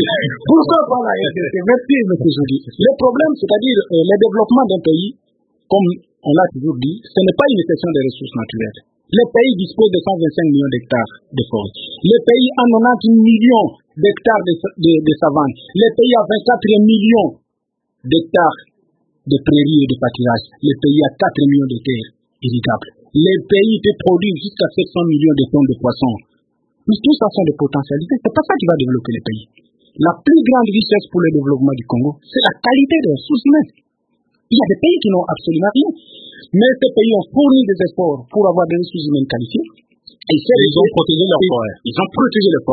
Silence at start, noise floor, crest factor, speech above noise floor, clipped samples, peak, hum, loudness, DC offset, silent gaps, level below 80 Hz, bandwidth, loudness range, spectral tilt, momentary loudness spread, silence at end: 0 s; -73 dBFS; 14 dB; 60 dB; under 0.1%; 0 dBFS; none; -14 LUFS; under 0.1%; none; -50 dBFS; 4.7 kHz; 3 LU; -9.5 dB/octave; 9 LU; 0 s